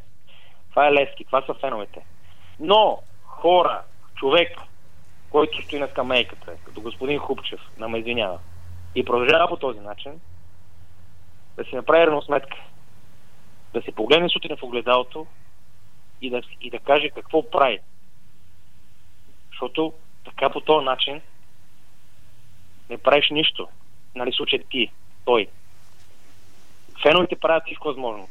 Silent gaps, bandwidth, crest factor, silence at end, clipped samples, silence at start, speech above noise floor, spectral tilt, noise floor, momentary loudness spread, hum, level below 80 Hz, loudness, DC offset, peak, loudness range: none; 14 kHz; 22 dB; 0.05 s; under 0.1%; 0.75 s; 36 dB; -5 dB/octave; -57 dBFS; 20 LU; none; -58 dBFS; -21 LUFS; 2%; -2 dBFS; 5 LU